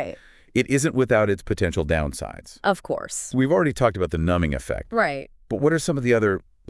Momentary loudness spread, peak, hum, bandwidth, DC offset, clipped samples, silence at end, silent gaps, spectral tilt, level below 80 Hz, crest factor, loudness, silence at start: 9 LU; -4 dBFS; none; 12 kHz; under 0.1%; under 0.1%; 0.3 s; none; -5.5 dB/octave; -42 dBFS; 18 dB; -23 LUFS; 0 s